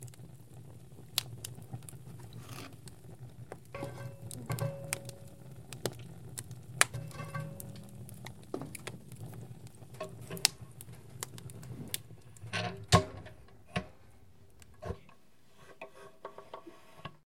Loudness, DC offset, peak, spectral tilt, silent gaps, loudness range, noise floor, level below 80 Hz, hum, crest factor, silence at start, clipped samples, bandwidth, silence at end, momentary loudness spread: -38 LUFS; 0.2%; 0 dBFS; -3.5 dB/octave; none; 11 LU; -64 dBFS; -60 dBFS; none; 40 dB; 0 s; under 0.1%; 16.5 kHz; 0 s; 21 LU